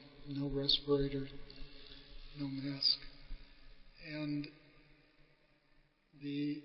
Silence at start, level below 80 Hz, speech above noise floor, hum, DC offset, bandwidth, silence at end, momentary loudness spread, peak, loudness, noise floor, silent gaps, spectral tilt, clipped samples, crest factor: 0 s; -54 dBFS; 33 dB; none; under 0.1%; 5.6 kHz; 0 s; 23 LU; -18 dBFS; -37 LUFS; -70 dBFS; none; -4 dB/octave; under 0.1%; 22 dB